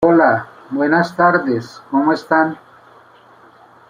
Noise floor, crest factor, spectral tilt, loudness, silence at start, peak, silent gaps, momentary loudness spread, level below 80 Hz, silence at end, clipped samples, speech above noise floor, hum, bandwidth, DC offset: -46 dBFS; 16 dB; -7.5 dB/octave; -16 LUFS; 0 s; 0 dBFS; none; 9 LU; -60 dBFS; 1.35 s; under 0.1%; 30 dB; none; 9.8 kHz; under 0.1%